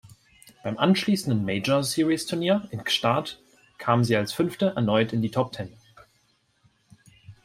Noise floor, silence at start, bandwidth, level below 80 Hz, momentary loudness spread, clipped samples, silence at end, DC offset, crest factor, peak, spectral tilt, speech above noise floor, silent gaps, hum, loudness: -67 dBFS; 0.05 s; 16 kHz; -62 dBFS; 12 LU; under 0.1%; 0.1 s; under 0.1%; 20 dB; -6 dBFS; -5.5 dB/octave; 43 dB; none; none; -24 LUFS